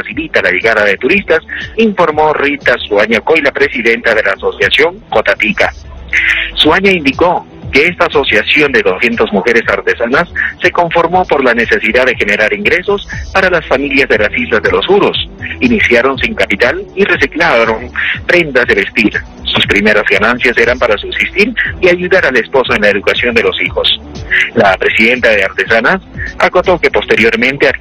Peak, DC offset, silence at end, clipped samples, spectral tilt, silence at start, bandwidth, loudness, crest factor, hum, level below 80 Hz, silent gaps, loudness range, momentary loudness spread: 0 dBFS; under 0.1%; 0 s; 0.7%; -4.5 dB/octave; 0 s; 14 kHz; -10 LUFS; 10 dB; none; -32 dBFS; none; 1 LU; 5 LU